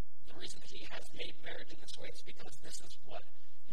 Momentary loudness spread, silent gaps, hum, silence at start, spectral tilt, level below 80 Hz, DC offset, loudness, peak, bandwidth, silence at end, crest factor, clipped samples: 8 LU; none; none; 0 s; -3.5 dB/octave; -66 dBFS; 5%; -49 LUFS; -22 dBFS; 16 kHz; 0 s; 20 dB; under 0.1%